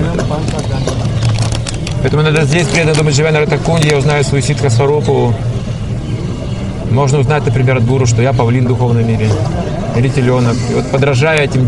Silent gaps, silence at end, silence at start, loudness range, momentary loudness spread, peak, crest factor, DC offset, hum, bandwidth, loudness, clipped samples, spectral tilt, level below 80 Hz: none; 0 s; 0 s; 3 LU; 7 LU; 0 dBFS; 12 dB; under 0.1%; none; 11.5 kHz; -13 LUFS; under 0.1%; -6 dB/octave; -28 dBFS